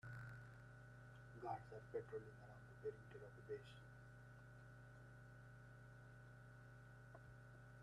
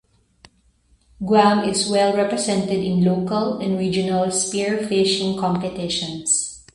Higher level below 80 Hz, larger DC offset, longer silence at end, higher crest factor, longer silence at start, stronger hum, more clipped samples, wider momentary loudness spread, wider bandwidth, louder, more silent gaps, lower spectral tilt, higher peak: second, -74 dBFS vs -54 dBFS; neither; second, 0 s vs 0.15 s; about the same, 20 dB vs 20 dB; second, 0.05 s vs 1.2 s; neither; neither; first, 11 LU vs 7 LU; about the same, 12 kHz vs 11.5 kHz; second, -58 LUFS vs -20 LUFS; neither; first, -7 dB/octave vs -4 dB/octave; second, -36 dBFS vs -2 dBFS